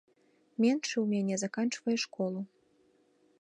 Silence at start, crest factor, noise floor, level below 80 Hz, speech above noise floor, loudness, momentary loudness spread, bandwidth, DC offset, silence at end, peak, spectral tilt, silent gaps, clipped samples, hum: 0.6 s; 18 dB; -68 dBFS; -84 dBFS; 37 dB; -32 LUFS; 11 LU; 10.5 kHz; under 0.1%; 0.95 s; -16 dBFS; -4.5 dB/octave; none; under 0.1%; none